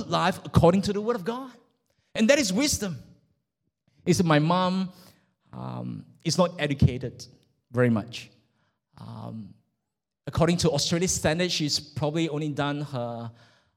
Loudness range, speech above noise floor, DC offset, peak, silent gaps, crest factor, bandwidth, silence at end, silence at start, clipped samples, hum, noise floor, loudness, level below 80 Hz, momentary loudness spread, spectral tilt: 4 LU; 59 dB; under 0.1%; -6 dBFS; none; 22 dB; 16.5 kHz; 0.45 s; 0 s; under 0.1%; none; -84 dBFS; -25 LUFS; -48 dBFS; 19 LU; -5 dB/octave